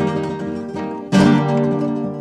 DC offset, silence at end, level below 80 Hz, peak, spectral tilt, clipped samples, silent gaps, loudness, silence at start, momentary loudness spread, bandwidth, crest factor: under 0.1%; 0 s; -50 dBFS; -2 dBFS; -7 dB/octave; under 0.1%; none; -18 LUFS; 0 s; 12 LU; 11.5 kHz; 16 dB